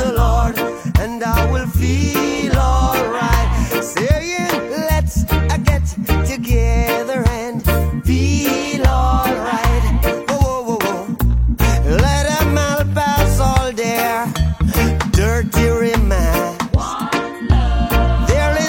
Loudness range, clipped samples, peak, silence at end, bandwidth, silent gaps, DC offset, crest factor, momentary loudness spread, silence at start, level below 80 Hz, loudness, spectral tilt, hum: 1 LU; under 0.1%; 0 dBFS; 0 s; 17 kHz; none; under 0.1%; 16 dB; 4 LU; 0 s; -20 dBFS; -17 LUFS; -5.5 dB/octave; none